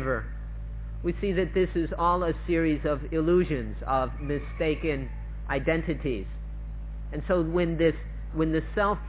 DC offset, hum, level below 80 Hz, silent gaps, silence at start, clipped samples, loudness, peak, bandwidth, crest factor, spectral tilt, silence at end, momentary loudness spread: under 0.1%; none; -36 dBFS; none; 0 s; under 0.1%; -28 LUFS; -12 dBFS; 4 kHz; 16 dB; -11 dB/octave; 0 s; 14 LU